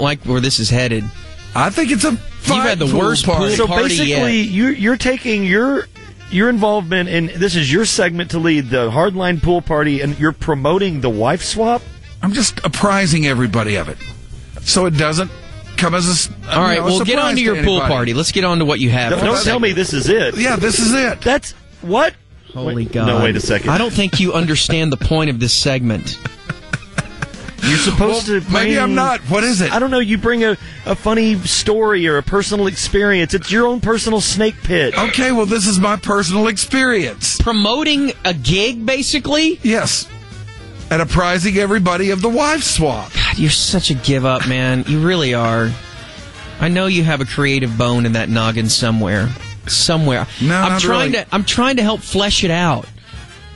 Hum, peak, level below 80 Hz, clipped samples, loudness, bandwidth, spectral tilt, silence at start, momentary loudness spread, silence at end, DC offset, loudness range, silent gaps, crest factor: none; -2 dBFS; -32 dBFS; under 0.1%; -15 LUFS; 11.5 kHz; -4 dB/octave; 0 s; 9 LU; 0 s; 0.5%; 2 LU; none; 14 dB